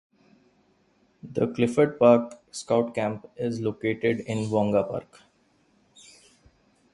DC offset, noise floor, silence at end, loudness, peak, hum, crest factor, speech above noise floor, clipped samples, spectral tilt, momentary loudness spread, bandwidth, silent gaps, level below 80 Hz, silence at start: under 0.1%; -65 dBFS; 1.9 s; -25 LUFS; -4 dBFS; none; 22 dB; 40 dB; under 0.1%; -6.5 dB/octave; 13 LU; 11.5 kHz; none; -62 dBFS; 1.25 s